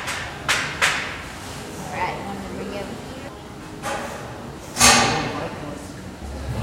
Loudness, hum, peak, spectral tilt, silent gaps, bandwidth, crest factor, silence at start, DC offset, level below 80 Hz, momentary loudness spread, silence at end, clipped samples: -22 LUFS; none; 0 dBFS; -2 dB/octave; none; 16 kHz; 24 dB; 0 s; under 0.1%; -42 dBFS; 20 LU; 0 s; under 0.1%